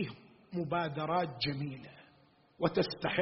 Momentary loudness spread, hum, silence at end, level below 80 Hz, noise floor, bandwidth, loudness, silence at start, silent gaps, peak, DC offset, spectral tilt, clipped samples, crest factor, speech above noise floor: 14 LU; none; 0 s; -66 dBFS; -66 dBFS; 5.8 kHz; -35 LUFS; 0 s; none; -14 dBFS; under 0.1%; -4 dB/octave; under 0.1%; 20 dB; 32 dB